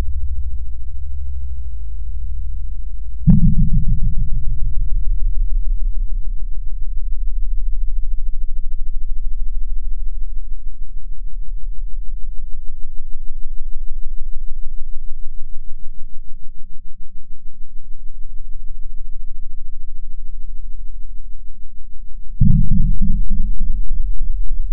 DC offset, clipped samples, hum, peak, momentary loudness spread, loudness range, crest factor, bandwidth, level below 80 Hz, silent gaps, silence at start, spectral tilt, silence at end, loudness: 20%; under 0.1%; none; 0 dBFS; 19 LU; 17 LU; 14 dB; 0.4 kHz; -22 dBFS; none; 0 s; -13.5 dB/octave; 0 s; -26 LUFS